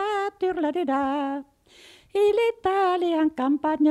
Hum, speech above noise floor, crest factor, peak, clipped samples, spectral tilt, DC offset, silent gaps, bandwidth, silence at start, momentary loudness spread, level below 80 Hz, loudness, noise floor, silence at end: none; 30 dB; 12 dB; -12 dBFS; under 0.1%; -5 dB/octave; under 0.1%; none; 12 kHz; 0 s; 7 LU; -62 dBFS; -24 LUFS; -52 dBFS; 0 s